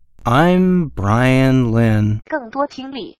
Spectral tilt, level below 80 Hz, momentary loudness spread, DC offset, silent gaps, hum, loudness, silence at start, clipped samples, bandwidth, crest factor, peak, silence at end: -7.5 dB/octave; -38 dBFS; 10 LU; under 0.1%; none; none; -16 LUFS; 0.25 s; under 0.1%; 13 kHz; 14 dB; -2 dBFS; 0.1 s